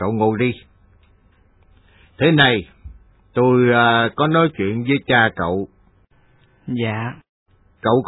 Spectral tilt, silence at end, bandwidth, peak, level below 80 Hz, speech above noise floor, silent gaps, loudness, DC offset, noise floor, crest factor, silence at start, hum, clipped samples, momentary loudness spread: -9.5 dB/octave; 0 s; 4.1 kHz; 0 dBFS; -50 dBFS; 38 dB; 7.29-7.46 s; -17 LUFS; under 0.1%; -55 dBFS; 20 dB; 0 s; none; under 0.1%; 15 LU